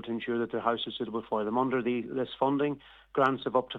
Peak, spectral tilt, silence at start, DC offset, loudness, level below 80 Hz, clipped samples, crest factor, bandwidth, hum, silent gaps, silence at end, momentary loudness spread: -12 dBFS; -7.5 dB/octave; 0 s; under 0.1%; -30 LUFS; -66 dBFS; under 0.1%; 20 dB; 7.2 kHz; none; none; 0 s; 7 LU